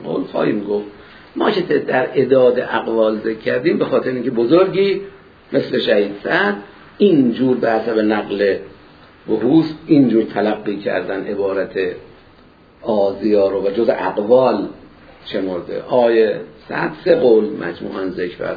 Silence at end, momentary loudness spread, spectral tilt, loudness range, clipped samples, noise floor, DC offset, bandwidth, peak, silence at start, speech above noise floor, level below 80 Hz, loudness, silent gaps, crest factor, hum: 0 s; 11 LU; -8.5 dB/octave; 3 LU; under 0.1%; -47 dBFS; under 0.1%; 5 kHz; 0 dBFS; 0 s; 31 dB; -54 dBFS; -17 LUFS; none; 16 dB; none